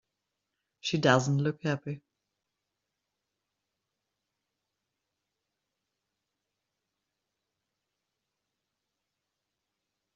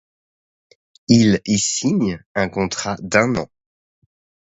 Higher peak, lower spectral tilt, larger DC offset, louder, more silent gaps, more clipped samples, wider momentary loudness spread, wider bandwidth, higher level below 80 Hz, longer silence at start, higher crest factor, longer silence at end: second, -6 dBFS vs 0 dBFS; about the same, -5 dB/octave vs -4.5 dB/octave; neither; second, -28 LUFS vs -18 LUFS; second, none vs 2.26-2.35 s; neither; first, 15 LU vs 11 LU; about the same, 7.4 kHz vs 8 kHz; second, -74 dBFS vs -50 dBFS; second, 0.85 s vs 1.1 s; first, 30 dB vs 20 dB; first, 8.15 s vs 0.95 s